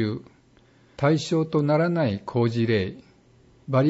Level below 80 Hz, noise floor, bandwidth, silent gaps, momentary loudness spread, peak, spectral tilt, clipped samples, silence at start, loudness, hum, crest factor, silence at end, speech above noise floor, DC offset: -60 dBFS; -57 dBFS; 8 kHz; none; 10 LU; -8 dBFS; -7.5 dB/octave; under 0.1%; 0 s; -24 LUFS; none; 16 dB; 0 s; 34 dB; under 0.1%